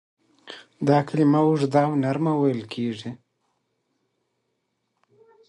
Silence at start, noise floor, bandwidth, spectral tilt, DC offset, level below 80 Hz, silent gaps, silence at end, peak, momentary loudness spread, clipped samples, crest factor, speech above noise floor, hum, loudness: 0.45 s; -76 dBFS; 10.5 kHz; -8 dB/octave; under 0.1%; -70 dBFS; none; 2.35 s; -6 dBFS; 20 LU; under 0.1%; 20 dB; 54 dB; none; -22 LUFS